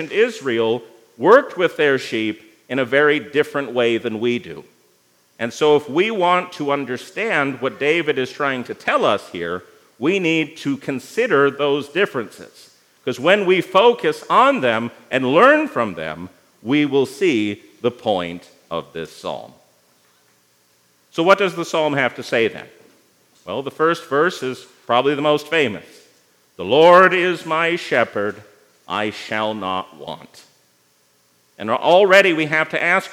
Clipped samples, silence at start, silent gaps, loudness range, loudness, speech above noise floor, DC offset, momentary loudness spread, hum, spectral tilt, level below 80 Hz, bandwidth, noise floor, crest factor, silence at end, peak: under 0.1%; 0 s; none; 7 LU; -18 LUFS; 41 dB; under 0.1%; 16 LU; none; -5 dB/octave; -72 dBFS; 16 kHz; -59 dBFS; 20 dB; 0 s; 0 dBFS